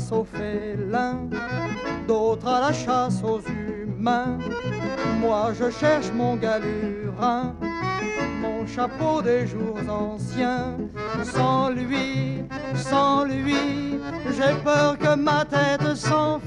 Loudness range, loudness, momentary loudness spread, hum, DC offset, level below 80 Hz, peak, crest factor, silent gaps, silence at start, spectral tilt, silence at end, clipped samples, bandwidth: 4 LU; -24 LUFS; 8 LU; none; under 0.1%; -48 dBFS; -6 dBFS; 16 dB; none; 0 s; -6 dB/octave; 0 s; under 0.1%; 11 kHz